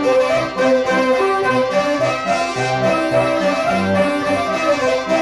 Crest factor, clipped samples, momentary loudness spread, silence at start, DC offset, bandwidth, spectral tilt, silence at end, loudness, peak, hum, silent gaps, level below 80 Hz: 12 dB; under 0.1%; 3 LU; 0 s; under 0.1%; 12.5 kHz; -5 dB/octave; 0 s; -17 LUFS; -4 dBFS; none; none; -48 dBFS